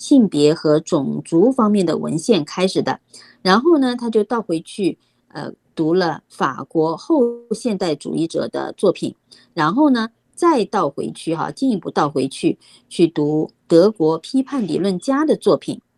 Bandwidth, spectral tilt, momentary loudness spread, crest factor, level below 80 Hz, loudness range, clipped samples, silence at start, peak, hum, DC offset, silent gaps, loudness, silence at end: 12 kHz; -6 dB/octave; 10 LU; 18 dB; -62 dBFS; 3 LU; under 0.1%; 0 s; 0 dBFS; none; under 0.1%; none; -18 LUFS; 0.2 s